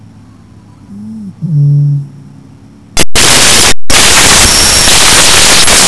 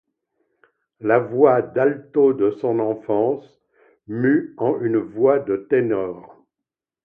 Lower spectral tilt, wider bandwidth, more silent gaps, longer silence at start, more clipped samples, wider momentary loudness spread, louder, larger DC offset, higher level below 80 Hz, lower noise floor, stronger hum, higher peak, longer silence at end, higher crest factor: second, -1.5 dB/octave vs -11 dB/octave; first, 11 kHz vs 3.5 kHz; neither; second, 0 s vs 1 s; first, 10% vs under 0.1%; first, 14 LU vs 9 LU; first, -3 LUFS vs -20 LUFS; neither; first, -22 dBFS vs -66 dBFS; second, -35 dBFS vs -86 dBFS; neither; about the same, 0 dBFS vs -2 dBFS; second, 0 s vs 0.8 s; second, 6 dB vs 20 dB